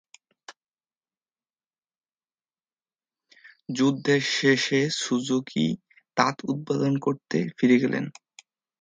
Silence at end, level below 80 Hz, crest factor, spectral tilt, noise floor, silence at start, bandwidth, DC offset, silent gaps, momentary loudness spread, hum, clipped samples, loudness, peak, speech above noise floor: 0.7 s; -72 dBFS; 24 dB; -5 dB/octave; under -90 dBFS; 0.5 s; 9.4 kHz; under 0.1%; 0.66-0.71 s; 10 LU; none; under 0.1%; -24 LUFS; -2 dBFS; over 66 dB